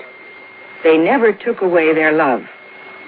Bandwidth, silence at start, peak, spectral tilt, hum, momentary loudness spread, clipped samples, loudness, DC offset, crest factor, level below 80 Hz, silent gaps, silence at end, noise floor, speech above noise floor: 4.7 kHz; 0 s; -2 dBFS; -9.5 dB/octave; none; 23 LU; under 0.1%; -14 LUFS; under 0.1%; 14 dB; -64 dBFS; none; 0 s; -38 dBFS; 24 dB